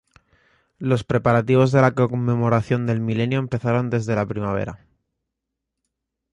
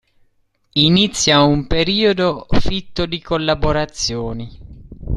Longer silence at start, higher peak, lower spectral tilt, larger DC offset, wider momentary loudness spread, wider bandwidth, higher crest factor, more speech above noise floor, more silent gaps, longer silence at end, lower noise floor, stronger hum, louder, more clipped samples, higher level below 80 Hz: about the same, 0.8 s vs 0.75 s; second, -4 dBFS vs 0 dBFS; first, -8 dB/octave vs -4.5 dB/octave; neither; second, 8 LU vs 12 LU; second, 8.6 kHz vs 12 kHz; about the same, 18 dB vs 16 dB; first, 62 dB vs 45 dB; neither; first, 1.55 s vs 0 s; first, -82 dBFS vs -61 dBFS; neither; second, -21 LUFS vs -17 LUFS; neither; second, -50 dBFS vs -30 dBFS